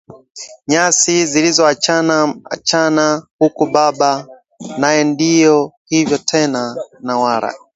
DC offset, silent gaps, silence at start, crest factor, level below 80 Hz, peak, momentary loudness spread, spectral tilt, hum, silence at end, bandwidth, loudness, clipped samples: under 0.1%; 0.30-0.35 s, 3.31-3.39 s, 5.77-5.85 s; 0.1 s; 14 dB; -60 dBFS; 0 dBFS; 12 LU; -3 dB/octave; none; 0.2 s; 8.2 kHz; -14 LUFS; under 0.1%